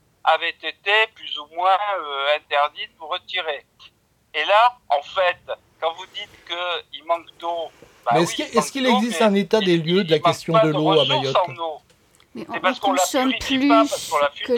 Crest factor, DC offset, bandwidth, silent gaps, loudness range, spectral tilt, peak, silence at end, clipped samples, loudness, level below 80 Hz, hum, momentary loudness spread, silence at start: 18 dB; under 0.1%; 17.5 kHz; none; 6 LU; -4 dB/octave; -2 dBFS; 0 s; under 0.1%; -20 LUFS; -58 dBFS; none; 13 LU; 0.25 s